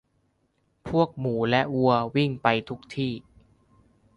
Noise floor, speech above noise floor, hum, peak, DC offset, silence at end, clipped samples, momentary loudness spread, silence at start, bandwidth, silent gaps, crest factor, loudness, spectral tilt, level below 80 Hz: -70 dBFS; 46 dB; none; -6 dBFS; under 0.1%; 0.95 s; under 0.1%; 11 LU; 0.85 s; 11 kHz; none; 22 dB; -25 LUFS; -7.5 dB/octave; -58 dBFS